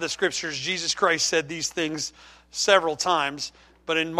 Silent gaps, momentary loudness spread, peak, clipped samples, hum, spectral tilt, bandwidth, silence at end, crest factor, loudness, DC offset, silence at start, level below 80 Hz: none; 13 LU; -4 dBFS; under 0.1%; none; -1.5 dB/octave; 15.5 kHz; 0 s; 22 dB; -24 LUFS; under 0.1%; 0 s; -60 dBFS